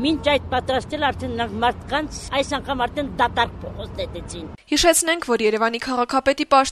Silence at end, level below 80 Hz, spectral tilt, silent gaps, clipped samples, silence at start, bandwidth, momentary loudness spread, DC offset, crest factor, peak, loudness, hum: 0 s; -40 dBFS; -3 dB/octave; none; under 0.1%; 0 s; 13.5 kHz; 13 LU; under 0.1%; 20 dB; -2 dBFS; -21 LUFS; none